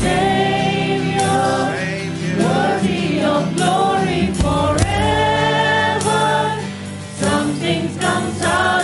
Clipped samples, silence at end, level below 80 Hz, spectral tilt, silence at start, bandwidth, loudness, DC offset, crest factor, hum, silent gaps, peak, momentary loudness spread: under 0.1%; 0 s; -36 dBFS; -5 dB/octave; 0 s; 11.5 kHz; -17 LUFS; under 0.1%; 16 dB; none; none; -2 dBFS; 6 LU